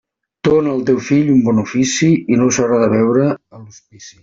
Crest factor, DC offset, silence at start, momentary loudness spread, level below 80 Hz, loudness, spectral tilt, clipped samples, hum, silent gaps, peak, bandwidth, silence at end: 12 dB; under 0.1%; 0.45 s; 4 LU; -50 dBFS; -14 LUFS; -5.5 dB/octave; under 0.1%; none; none; -2 dBFS; 7.8 kHz; 0.1 s